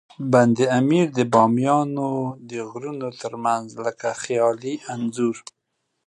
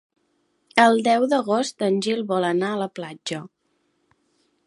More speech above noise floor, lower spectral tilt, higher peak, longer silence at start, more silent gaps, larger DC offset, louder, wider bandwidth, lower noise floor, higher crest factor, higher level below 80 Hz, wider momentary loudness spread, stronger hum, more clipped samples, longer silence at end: first, 54 dB vs 48 dB; first, -6.5 dB/octave vs -4.5 dB/octave; about the same, -2 dBFS vs 0 dBFS; second, 0.2 s vs 0.75 s; neither; neither; about the same, -22 LUFS vs -22 LUFS; about the same, 11 kHz vs 11.5 kHz; first, -76 dBFS vs -69 dBFS; about the same, 20 dB vs 24 dB; about the same, -68 dBFS vs -72 dBFS; about the same, 13 LU vs 14 LU; neither; neither; second, 0.7 s vs 1.2 s